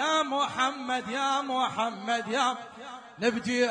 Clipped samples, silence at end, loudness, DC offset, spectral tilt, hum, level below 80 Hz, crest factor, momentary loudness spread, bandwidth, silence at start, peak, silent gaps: under 0.1%; 0 s; -28 LUFS; under 0.1%; -3 dB/octave; none; -72 dBFS; 16 dB; 10 LU; 10.5 kHz; 0 s; -12 dBFS; none